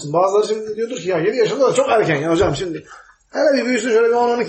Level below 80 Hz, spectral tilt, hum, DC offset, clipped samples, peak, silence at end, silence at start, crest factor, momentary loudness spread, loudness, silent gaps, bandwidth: -46 dBFS; -5 dB/octave; none; under 0.1%; under 0.1%; -4 dBFS; 0 s; 0 s; 14 dB; 9 LU; -17 LUFS; none; 8.8 kHz